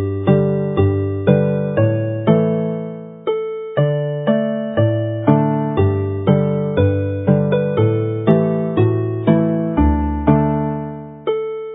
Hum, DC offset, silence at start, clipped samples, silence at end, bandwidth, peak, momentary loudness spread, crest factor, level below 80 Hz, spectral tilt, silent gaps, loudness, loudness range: none; under 0.1%; 0 s; under 0.1%; 0 s; 3.9 kHz; 0 dBFS; 7 LU; 16 dB; -32 dBFS; -13 dB/octave; none; -17 LUFS; 2 LU